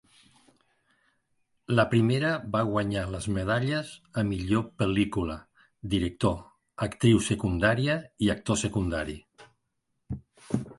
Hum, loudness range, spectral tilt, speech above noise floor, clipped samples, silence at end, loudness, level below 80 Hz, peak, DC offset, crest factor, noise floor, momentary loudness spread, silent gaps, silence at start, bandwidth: none; 3 LU; -6 dB/octave; 52 dB; under 0.1%; 0.05 s; -28 LUFS; -46 dBFS; -8 dBFS; under 0.1%; 20 dB; -78 dBFS; 15 LU; none; 1.7 s; 11.5 kHz